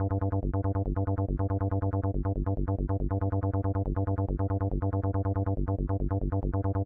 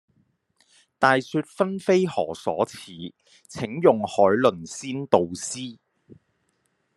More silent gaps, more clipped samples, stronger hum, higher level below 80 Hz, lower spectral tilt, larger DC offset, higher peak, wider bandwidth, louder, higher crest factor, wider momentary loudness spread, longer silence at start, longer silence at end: neither; neither; neither; first, -36 dBFS vs -68 dBFS; first, -14 dB/octave vs -5 dB/octave; neither; second, -18 dBFS vs -2 dBFS; second, 2.2 kHz vs 12.5 kHz; second, -30 LUFS vs -23 LUFS; second, 12 dB vs 24 dB; second, 1 LU vs 18 LU; second, 0 s vs 1 s; second, 0 s vs 1.25 s